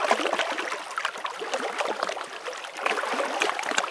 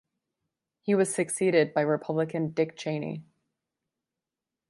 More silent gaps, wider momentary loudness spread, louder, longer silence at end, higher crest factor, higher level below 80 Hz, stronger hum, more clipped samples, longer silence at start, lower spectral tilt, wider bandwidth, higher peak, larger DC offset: neither; about the same, 9 LU vs 11 LU; about the same, -28 LUFS vs -27 LUFS; second, 0 s vs 1.45 s; about the same, 24 dB vs 20 dB; second, -82 dBFS vs -76 dBFS; neither; neither; second, 0 s vs 0.85 s; second, -0.5 dB/octave vs -5.5 dB/octave; about the same, 11 kHz vs 11.5 kHz; first, -4 dBFS vs -10 dBFS; neither